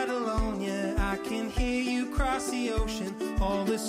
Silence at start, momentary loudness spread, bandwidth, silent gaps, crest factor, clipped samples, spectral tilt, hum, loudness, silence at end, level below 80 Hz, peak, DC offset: 0 s; 3 LU; 15.5 kHz; none; 12 dB; under 0.1%; -5 dB/octave; none; -30 LUFS; 0 s; -36 dBFS; -18 dBFS; under 0.1%